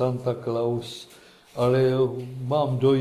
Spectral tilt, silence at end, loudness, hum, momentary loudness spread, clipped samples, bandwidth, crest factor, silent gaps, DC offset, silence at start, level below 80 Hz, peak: -7.5 dB/octave; 0 s; -25 LUFS; none; 15 LU; under 0.1%; 13.5 kHz; 14 dB; none; under 0.1%; 0 s; -60 dBFS; -10 dBFS